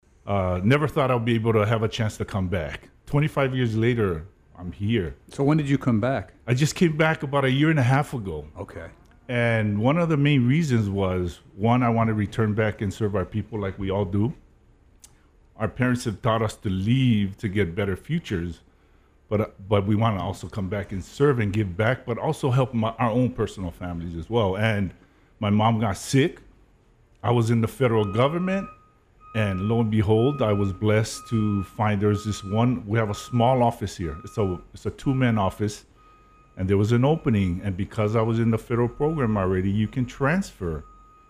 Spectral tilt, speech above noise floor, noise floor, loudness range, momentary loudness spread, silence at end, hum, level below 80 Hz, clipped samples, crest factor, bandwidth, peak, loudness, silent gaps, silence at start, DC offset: -7 dB/octave; 34 dB; -58 dBFS; 3 LU; 10 LU; 0.45 s; none; -48 dBFS; under 0.1%; 18 dB; 13.5 kHz; -6 dBFS; -24 LUFS; none; 0.25 s; under 0.1%